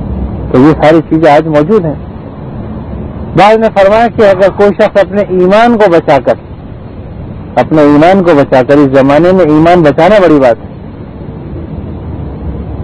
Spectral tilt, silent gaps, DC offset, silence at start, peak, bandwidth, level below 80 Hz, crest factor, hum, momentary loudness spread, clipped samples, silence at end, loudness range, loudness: -8 dB/octave; none; under 0.1%; 0 s; 0 dBFS; 11 kHz; -28 dBFS; 8 dB; none; 19 LU; 10%; 0 s; 3 LU; -6 LUFS